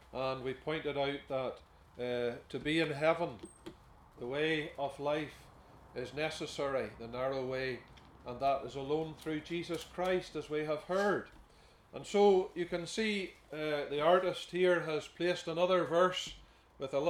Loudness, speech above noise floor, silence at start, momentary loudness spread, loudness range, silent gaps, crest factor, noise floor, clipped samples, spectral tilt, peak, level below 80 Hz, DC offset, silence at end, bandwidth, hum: -35 LUFS; 27 dB; 0.1 s; 16 LU; 6 LU; none; 20 dB; -62 dBFS; under 0.1%; -5 dB/octave; -16 dBFS; -64 dBFS; under 0.1%; 0 s; 13.5 kHz; none